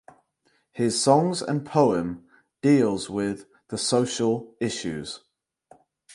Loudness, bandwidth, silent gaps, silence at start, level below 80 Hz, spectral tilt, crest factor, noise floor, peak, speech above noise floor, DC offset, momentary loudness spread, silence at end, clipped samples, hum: -24 LUFS; 11.5 kHz; none; 0.75 s; -60 dBFS; -5 dB/octave; 22 dB; -69 dBFS; -4 dBFS; 45 dB; under 0.1%; 16 LU; 1 s; under 0.1%; none